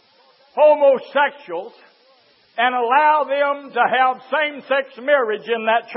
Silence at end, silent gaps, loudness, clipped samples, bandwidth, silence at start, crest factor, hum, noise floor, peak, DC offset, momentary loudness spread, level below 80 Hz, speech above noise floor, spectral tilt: 0 s; none; -18 LUFS; under 0.1%; 5.8 kHz; 0.55 s; 16 dB; none; -55 dBFS; -2 dBFS; under 0.1%; 10 LU; -88 dBFS; 37 dB; -7.5 dB/octave